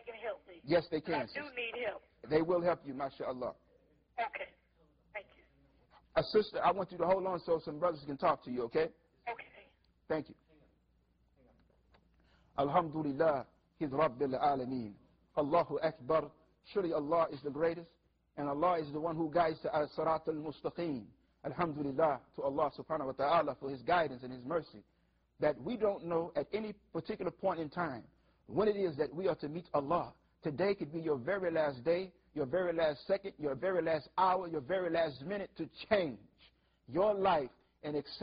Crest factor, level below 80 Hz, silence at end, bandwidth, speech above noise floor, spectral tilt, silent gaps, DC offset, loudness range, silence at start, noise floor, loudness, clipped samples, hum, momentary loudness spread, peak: 20 dB; -66 dBFS; 0 s; 5.6 kHz; 38 dB; -4.5 dB/octave; none; under 0.1%; 5 LU; 0.05 s; -73 dBFS; -36 LUFS; under 0.1%; none; 12 LU; -16 dBFS